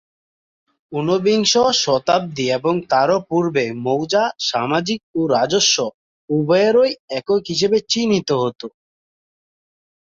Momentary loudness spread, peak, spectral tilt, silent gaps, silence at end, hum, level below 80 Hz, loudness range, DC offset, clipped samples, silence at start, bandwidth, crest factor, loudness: 9 LU; 0 dBFS; -4 dB/octave; 5.03-5.14 s, 5.94-6.28 s, 7.00-7.08 s; 1.4 s; none; -60 dBFS; 2 LU; under 0.1%; under 0.1%; 0.9 s; 7.8 kHz; 18 dB; -18 LUFS